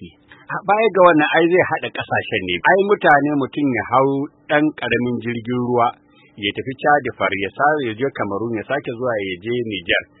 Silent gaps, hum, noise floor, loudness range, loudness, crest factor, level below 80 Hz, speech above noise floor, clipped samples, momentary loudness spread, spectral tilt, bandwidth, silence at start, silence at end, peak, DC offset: none; none; -41 dBFS; 5 LU; -18 LUFS; 18 dB; -56 dBFS; 23 dB; under 0.1%; 10 LU; -9 dB/octave; 4 kHz; 0 s; 0.15 s; 0 dBFS; under 0.1%